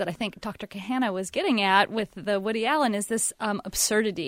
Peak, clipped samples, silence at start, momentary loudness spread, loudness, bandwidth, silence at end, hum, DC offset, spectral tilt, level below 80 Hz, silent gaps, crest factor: -4 dBFS; under 0.1%; 0 s; 11 LU; -25 LUFS; 16 kHz; 0 s; none; under 0.1%; -3 dB/octave; -56 dBFS; none; 22 dB